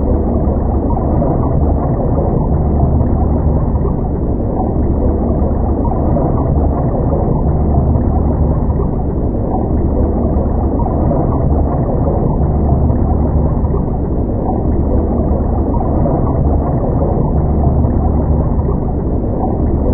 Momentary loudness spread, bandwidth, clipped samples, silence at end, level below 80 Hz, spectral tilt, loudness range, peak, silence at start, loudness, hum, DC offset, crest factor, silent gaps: 3 LU; 2.2 kHz; under 0.1%; 0 s; -16 dBFS; -16.5 dB/octave; 1 LU; 0 dBFS; 0 s; -15 LUFS; none; under 0.1%; 12 dB; none